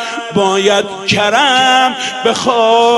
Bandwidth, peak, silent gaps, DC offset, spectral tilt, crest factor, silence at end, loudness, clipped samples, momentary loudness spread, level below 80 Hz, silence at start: 11.5 kHz; 0 dBFS; none; under 0.1%; -3 dB/octave; 12 dB; 0 s; -11 LUFS; under 0.1%; 6 LU; -52 dBFS; 0 s